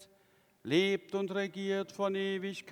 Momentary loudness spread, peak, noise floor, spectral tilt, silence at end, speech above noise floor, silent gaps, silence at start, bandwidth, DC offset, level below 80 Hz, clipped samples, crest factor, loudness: 6 LU; -16 dBFS; -68 dBFS; -5.5 dB/octave; 0 s; 34 dB; none; 0 s; 14.5 kHz; under 0.1%; -84 dBFS; under 0.1%; 20 dB; -33 LUFS